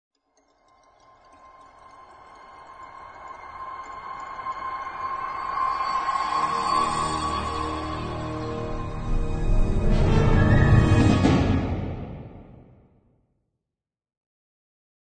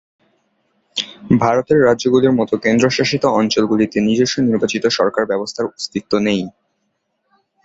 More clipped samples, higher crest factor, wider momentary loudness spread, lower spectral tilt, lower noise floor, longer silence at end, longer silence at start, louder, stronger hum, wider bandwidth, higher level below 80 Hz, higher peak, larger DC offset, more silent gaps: neither; about the same, 20 dB vs 16 dB; first, 22 LU vs 10 LU; first, -7 dB/octave vs -5 dB/octave; first, -88 dBFS vs -69 dBFS; first, 2.5 s vs 1.15 s; first, 2 s vs 0.95 s; second, -24 LUFS vs -16 LUFS; neither; first, 9.2 kHz vs 8 kHz; first, -30 dBFS vs -52 dBFS; second, -6 dBFS vs -2 dBFS; neither; neither